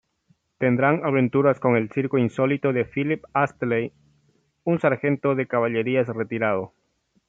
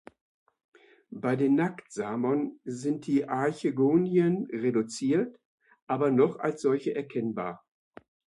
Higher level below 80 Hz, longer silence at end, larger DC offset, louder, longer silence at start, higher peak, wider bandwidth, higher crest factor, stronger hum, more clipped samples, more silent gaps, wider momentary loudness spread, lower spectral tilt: first, -64 dBFS vs -74 dBFS; second, 0.6 s vs 0.8 s; neither; first, -23 LUFS vs -28 LUFS; second, 0.6 s vs 1.1 s; first, -4 dBFS vs -12 dBFS; second, 7.8 kHz vs 11.5 kHz; about the same, 18 dB vs 18 dB; neither; neither; second, none vs 5.45-5.58 s, 5.82-5.87 s; second, 6 LU vs 10 LU; first, -9 dB/octave vs -7 dB/octave